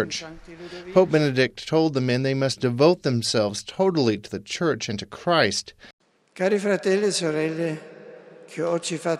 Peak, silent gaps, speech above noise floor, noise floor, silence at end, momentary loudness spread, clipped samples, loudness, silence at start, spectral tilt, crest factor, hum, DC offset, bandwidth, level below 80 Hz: -4 dBFS; 5.93-5.98 s; 22 dB; -45 dBFS; 0 s; 13 LU; under 0.1%; -23 LUFS; 0 s; -5 dB/octave; 20 dB; none; under 0.1%; 13 kHz; -60 dBFS